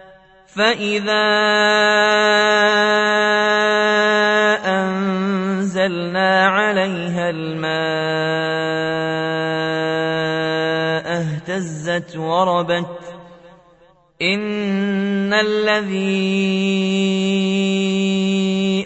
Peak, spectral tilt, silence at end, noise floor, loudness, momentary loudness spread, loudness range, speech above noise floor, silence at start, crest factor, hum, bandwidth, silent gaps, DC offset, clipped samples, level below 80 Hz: -2 dBFS; -5 dB/octave; 0 s; -52 dBFS; -17 LUFS; 8 LU; 7 LU; 35 dB; 0 s; 16 dB; none; 8.4 kHz; none; under 0.1%; under 0.1%; -60 dBFS